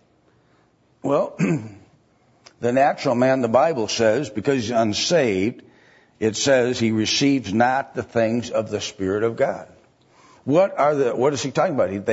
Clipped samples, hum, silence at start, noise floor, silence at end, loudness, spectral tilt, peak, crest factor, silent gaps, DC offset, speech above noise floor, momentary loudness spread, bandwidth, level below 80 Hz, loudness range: under 0.1%; none; 1.05 s; -60 dBFS; 0 s; -21 LUFS; -4.5 dB/octave; -4 dBFS; 18 dB; none; under 0.1%; 40 dB; 7 LU; 8 kHz; -62 dBFS; 3 LU